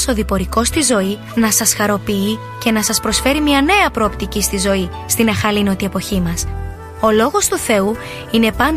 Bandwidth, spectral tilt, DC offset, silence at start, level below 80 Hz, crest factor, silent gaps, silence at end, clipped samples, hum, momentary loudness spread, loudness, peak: 15.5 kHz; -3.5 dB/octave; 0.1%; 0 s; -30 dBFS; 16 dB; none; 0 s; under 0.1%; none; 7 LU; -15 LUFS; 0 dBFS